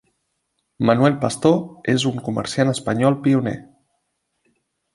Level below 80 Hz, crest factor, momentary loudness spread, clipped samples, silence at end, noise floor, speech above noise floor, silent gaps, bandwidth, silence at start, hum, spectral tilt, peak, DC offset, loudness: -56 dBFS; 18 dB; 7 LU; under 0.1%; 1.3 s; -73 dBFS; 54 dB; none; 11.5 kHz; 0.8 s; none; -6 dB/octave; -2 dBFS; under 0.1%; -19 LUFS